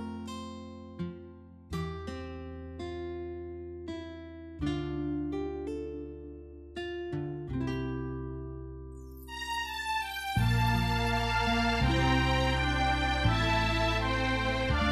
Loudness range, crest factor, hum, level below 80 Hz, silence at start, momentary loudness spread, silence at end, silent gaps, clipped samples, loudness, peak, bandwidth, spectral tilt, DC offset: 13 LU; 18 dB; none; -40 dBFS; 0 s; 17 LU; 0 s; none; under 0.1%; -32 LUFS; -14 dBFS; 13.5 kHz; -5.5 dB/octave; under 0.1%